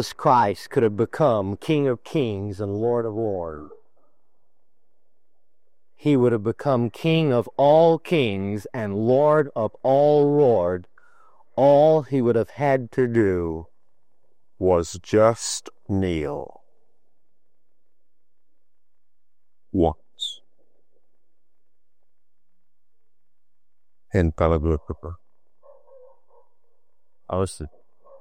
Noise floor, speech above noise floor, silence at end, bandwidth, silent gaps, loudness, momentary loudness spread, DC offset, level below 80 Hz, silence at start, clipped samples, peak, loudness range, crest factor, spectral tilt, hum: -84 dBFS; 63 dB; 0.5 s; 15.5 kHz; none; -22 LUFS; 14 LU; 0.5%; -48 dBFS; 0 s; under 0.1%; -4 dBFS; 12 LU; 20 dB; -6.5 dB/octave; none